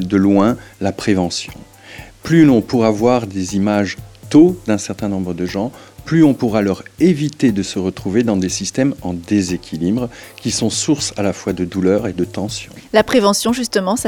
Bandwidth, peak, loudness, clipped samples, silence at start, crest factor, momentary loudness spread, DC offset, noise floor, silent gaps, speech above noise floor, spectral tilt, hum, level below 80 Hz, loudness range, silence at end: 17.5 kHz; 0 dBFS; -16 LUFS; under 0.1%; 0 s; 16 dB; 12 LU; under 0.1%; -37 dBFS; none; 21 dB; -5.5 dB/octave; none; -46 dBFS; 4 LU; 0 s